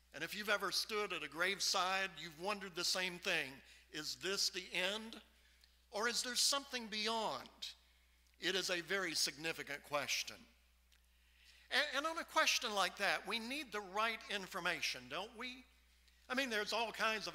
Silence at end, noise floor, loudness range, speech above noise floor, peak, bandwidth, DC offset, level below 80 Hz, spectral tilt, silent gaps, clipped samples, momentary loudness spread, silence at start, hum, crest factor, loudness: 0 s; -71 dBFS; 3 LU; 31 dB; -18 dBFS; 16 kHz; under 0.1%; -72 dBFS; -1 dB/octave; none; under 0.1%; 12 LU; 0.15 s; none; 22 dB; -39 LUFS